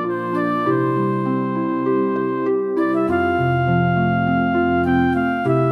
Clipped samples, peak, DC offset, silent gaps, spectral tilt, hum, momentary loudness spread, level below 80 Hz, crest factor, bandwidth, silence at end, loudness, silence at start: under 0.1%; -6 dBFS; under 0.1%; none; -9.5 dB/octave; none; 3 LU; -46 dBFS; 12 dB; 5.8 kHz; 0 s; -19 LUFS; 0 s